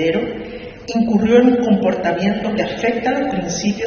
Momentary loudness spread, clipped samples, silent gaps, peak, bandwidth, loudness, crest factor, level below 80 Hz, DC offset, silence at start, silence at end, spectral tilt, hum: 13 LU; under 0.1%; none; 0 dBFS; 6.8 kHz; -17 LUFS; 16 dB; -46 dBFS; under 0.1%; 0 s; 0 s; -5 dB/octave; none